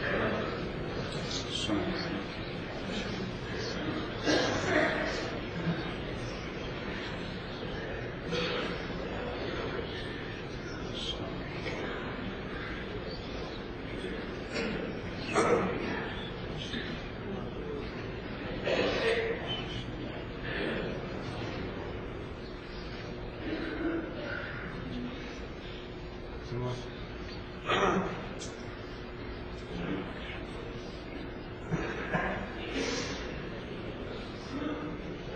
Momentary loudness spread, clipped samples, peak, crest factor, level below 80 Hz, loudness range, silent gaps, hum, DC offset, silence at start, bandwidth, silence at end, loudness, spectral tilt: 12 LU; under 0.1%; -14 dBFS; 22 dB; -48 dBFS; 6 LU; none; none; under 0.1%; 0 s; 9 kHz; 0 s; -35 LUFS; -5 dB/octave